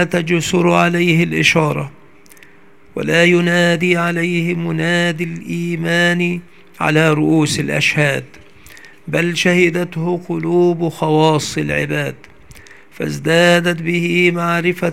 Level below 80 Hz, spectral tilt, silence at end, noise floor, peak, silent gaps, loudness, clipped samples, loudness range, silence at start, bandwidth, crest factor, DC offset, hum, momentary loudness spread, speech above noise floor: -52 dBFS; -5 dB/octave; 0 s; -47 dBFS; 0 dBFS; none; -15 LUFS; under 0.1%; 2 LU; 0 s; 15.5 kHz; 16 dB; 0.6%; none; 9 LU; 32 dB